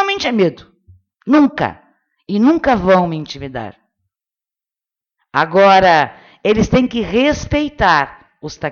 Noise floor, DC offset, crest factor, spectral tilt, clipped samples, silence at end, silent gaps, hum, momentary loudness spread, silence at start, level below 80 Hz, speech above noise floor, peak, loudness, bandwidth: -89 dBFS; under 0.1%; 16 dB; -6 dB/octave; under 0.1%; 0 s; none; none; 16 LU; 0 s; -38 dBFS; 75 dB; 0 dBFS; -14 LUFS; 7.2 kHz